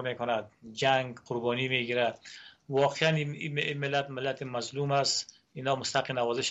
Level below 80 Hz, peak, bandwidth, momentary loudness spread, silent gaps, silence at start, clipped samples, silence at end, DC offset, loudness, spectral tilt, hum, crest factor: -72 dBFS; -10 dBFS; 8.2 kHz; 9 LU; none; 0 s; under 0.1%; 0 s; under 0.1%; -30 LUFS; -4 dB/octave; none; 20 dB